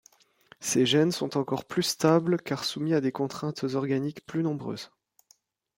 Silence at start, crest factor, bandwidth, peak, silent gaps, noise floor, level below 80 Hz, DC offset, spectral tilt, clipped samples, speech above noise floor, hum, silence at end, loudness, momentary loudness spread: 0.6 s; 20 dB; 16.5 kHz; -8 dBFS; none; -65 dBFS; -70 dBFS; under 0.1%; -5 dB/octave; under 0.1%; 38 dB; none; 0.9 s; -27 LUFS; 11 LU